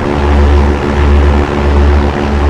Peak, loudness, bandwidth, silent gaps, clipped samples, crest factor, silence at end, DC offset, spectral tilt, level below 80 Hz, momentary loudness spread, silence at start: 0 dBFS; -10 LUFS; 7.6 kHz; none; 0.4%; 8 dB; 0 s; 2%; -7.5 dB/octave; -10 dBFS; 3 LU; 0 s